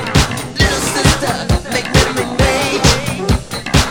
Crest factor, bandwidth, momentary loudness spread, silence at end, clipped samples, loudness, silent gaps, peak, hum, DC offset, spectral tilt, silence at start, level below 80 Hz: 14 dB; 19 kHz; 5 LU; 0 s; under 0.1%; -14 LUFS; none; 0 dBFS; none; under 0.1%; -4 dB/octave; 0 s; -22 dBFS